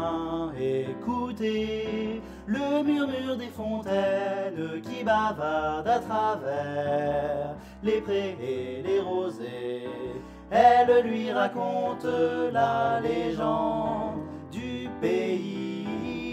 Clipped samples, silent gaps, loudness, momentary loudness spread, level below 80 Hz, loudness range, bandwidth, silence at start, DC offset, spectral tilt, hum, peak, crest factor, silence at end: under 0.1%; none; -28 LUFS; 10 LU; -54 dBFS; 5 LU; 13.5 kHz; 0 s; under 0.1%; -6.5 dB/octave; none; -8 dBFS; 20 dB; 0 s